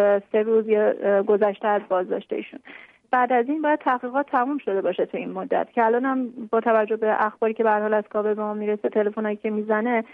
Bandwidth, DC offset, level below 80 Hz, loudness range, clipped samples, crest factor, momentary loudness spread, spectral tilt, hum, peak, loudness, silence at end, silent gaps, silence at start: 3.8 kHz; under 0.1%; -76 dBFS; 2 LU; under 0.1%; 14 dB; 7 LU; -9 dB/octave; none; -8 dBFS; -23 LUFS; 0.1 s; none; 0 s